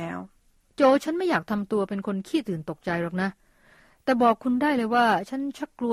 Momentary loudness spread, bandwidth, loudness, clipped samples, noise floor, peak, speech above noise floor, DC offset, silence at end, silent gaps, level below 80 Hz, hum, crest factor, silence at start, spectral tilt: 11 LU; 15 kHz; -25 LUFS; under 0.1%; -62 dBFS; -8 dBFS; 38 dB; under 0.1%; 0 s; none; -62 dBFS; none; 18 dB; 0 s; -6 dB/octave